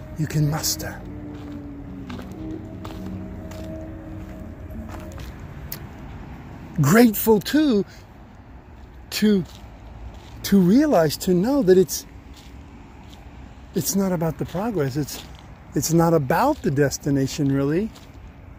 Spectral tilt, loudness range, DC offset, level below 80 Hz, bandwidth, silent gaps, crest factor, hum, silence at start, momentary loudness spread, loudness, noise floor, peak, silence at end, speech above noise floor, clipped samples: -5.5 dB/octave; 15 LU; under 0.1%; -42 dBFS; 16 kHz; none; 20 dB; none; 0 s; 24 LU; -21 LUFS; -44 dBFS; -2 dBFS; 0 s; 24 dB; under 0.1%